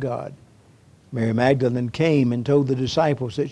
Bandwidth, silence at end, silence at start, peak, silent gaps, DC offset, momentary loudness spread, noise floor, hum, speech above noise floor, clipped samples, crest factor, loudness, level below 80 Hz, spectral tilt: 11 kHz; 0 s; 0 s; -4 dBFS; none; under 0.1%; 11 LU; -52 dBFS; none; 32 dB; under 0.1%; 18 dB; -21 LUFS; -54 dBFS; -7.5 dB/octave